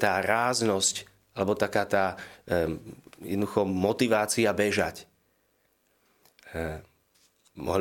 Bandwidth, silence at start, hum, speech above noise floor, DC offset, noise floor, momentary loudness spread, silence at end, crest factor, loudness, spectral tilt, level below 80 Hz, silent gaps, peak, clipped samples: 17 kHz; 0 s; none; 43 dB; under 0.1%; -70 dBFS; 16 LU; 0 s; 22 dB; -27 LUFS; -4 dB/octave; -56 dBFS; none; -6 dBFS; under 0.1%